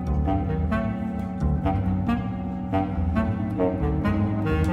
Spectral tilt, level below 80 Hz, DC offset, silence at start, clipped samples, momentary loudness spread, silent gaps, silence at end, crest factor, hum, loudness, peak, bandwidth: -9.5 dB/octave; -32 dBFS; under 0.1%; 0 s; under 0.1%; 4 LU; none; 0 s; 16 dB; none; -25 LUFS; -8 dBFS; 8.8 kHz